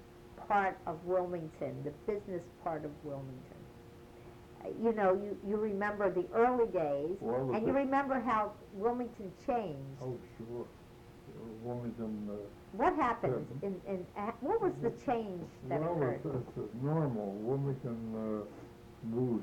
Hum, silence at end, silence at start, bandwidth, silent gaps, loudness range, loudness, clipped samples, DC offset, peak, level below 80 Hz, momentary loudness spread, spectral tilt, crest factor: none; 0 s; 0 s; 18.5 kHz; none; 9 LU; -36 LUFS; under 0.1%; under 0.1%; -18 dBFS; -62 dBFS; 18 LU; -8.5 dB/octave; 18 dB